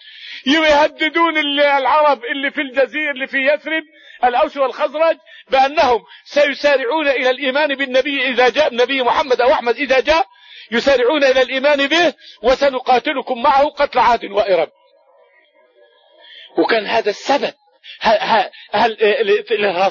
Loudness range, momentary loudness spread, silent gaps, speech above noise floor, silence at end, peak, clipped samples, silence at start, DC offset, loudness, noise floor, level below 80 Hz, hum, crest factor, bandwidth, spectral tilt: 4 LU; 6 LU; none; 38 dB; 0 s; -2 dBFS; under 0.1%; 0.05 s; under 0.1%; -15 LUFS; -53 dBFS; -50 dBFS; none; 14 dB; 7.4 kHz; -3 dB/octave